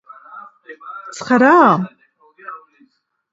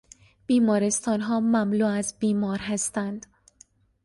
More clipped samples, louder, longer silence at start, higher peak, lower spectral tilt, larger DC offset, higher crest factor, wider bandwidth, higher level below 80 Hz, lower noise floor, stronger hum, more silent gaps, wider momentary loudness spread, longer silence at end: neither; first, -12 LUFS vs -25 LUFS; second, 0.35 s vs 0.5 s; first, 0 dBFS vs -12 dBFS; about the same, -6 dB/octave vs -5 dB/octave; neither; about the same, 18 dB vs 14 dB; second, 8 kHz vs 11.5 kHz; about the same, -66 dBFS vs -62 dBFS; about the same, -58 dBFS vs -58 dBFS; neither; neither; first, 28 LU vs 9 LU; about the same, 0.75 s vs 0.85 s